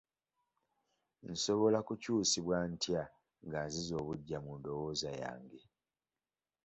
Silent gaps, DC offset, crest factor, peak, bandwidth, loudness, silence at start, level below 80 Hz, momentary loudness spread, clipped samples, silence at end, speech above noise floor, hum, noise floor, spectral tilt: none; under 0.1%; 20 dB; -20 dBFS; 8 kHz; -37 LUFS; 1.25 s; -66 dBFS; 13 LU; under 0.1%; 1.05 s; over 53 dB; none; under -90 dBFS; -4.5 dB/octave